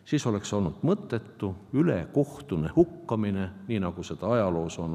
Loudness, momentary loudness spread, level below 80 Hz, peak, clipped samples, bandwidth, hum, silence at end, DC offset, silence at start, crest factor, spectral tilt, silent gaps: -28 LUFS; 8 LU; -56 dBFS; -8 dBFS; under 0.1%; 12.5 kHz; none; 0 s; under 0.1%; 0.05 s; 20 dB; -7 dB/octave; none